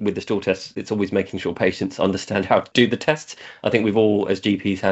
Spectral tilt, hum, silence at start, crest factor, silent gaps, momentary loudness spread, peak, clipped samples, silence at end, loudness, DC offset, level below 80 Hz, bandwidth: -5.5 dB/octave; none; 0 s; 20 dB; none; 8 LU; -2 dBFS; under 0.1%; 0 s; -21 LUFS; under 0.1%; -60 dBFS; 8.2 kHz